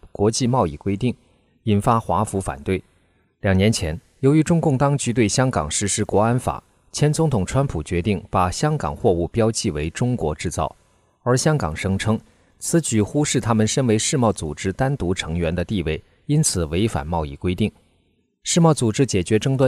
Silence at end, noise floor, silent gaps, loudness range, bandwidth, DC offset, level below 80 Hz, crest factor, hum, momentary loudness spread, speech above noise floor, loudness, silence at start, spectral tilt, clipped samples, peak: 0 s; -64 dBFS; none; 3 LU; 15.5 kHz; under 0.1%; -40 dBFS; 16 dB; none; 8 LU; 44 dB; -21 LUFS; 0.05 s; -5.5 dB/octave; under 0.1%; -4 dBFS